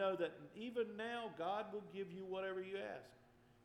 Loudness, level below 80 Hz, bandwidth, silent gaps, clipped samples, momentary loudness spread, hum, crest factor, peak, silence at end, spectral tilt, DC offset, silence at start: -46 LUFS; -82 dBFS; 13.5 kHz; none; under 0.1%; 7 LU; none; 16 dB; -28 dBFS; 0.1 s; -6 dB/octave; under 0.1%; 0 s